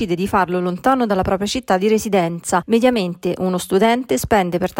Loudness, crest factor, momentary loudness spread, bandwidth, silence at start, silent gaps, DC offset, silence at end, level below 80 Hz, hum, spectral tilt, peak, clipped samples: -18 LUFS; 14 dB; 5 LU; 16.5 kHz; 0 s; none; under 0.1%; 0 s; -44 dBFS; none; -5 dB/octave; -4 dBFS; under 0.1%